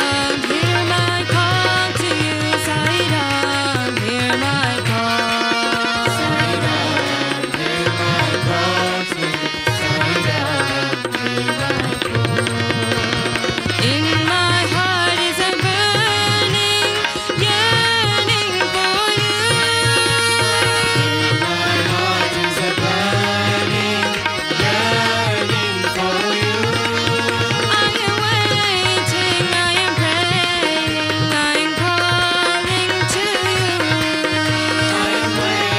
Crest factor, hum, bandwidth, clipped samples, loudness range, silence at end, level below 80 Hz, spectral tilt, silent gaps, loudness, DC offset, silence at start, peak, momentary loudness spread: 16 dB; none; 16 kHz; under 0.1%; 3 LU; 0 s; -46 dBFS; -3.5 dB/octave; none; -16 LUFS; under 0.1%; 0 s; 0 dBFS; 4 LU